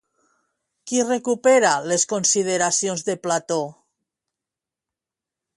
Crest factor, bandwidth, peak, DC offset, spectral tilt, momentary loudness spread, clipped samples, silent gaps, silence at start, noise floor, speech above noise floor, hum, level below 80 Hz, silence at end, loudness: 18 dB; 11.5 kHz; -4 dBFS; under 0.1%; -2.5 dB/octave; 9 LU; under 0.1%; none; 0.85 s; -88 dBFS; 67 dB; none; -70 dBFS; 1.85 s; -20 LUFS